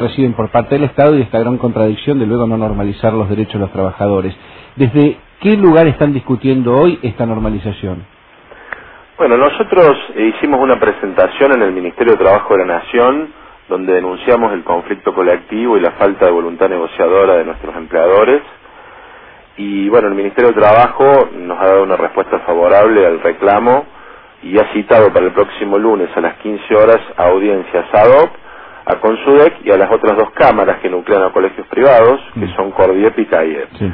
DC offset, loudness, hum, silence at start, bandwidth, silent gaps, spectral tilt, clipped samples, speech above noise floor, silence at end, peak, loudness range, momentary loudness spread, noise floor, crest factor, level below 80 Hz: 0.2%; -11 LUFS; none; 0 s; 5.2 kHz; none; -10.5 dB/octave; 0.1%; 29 dB; 0 s; 0 dBFS; 4 LU; 10 LU; -39 dBFS; 12 dB; -40 dBFS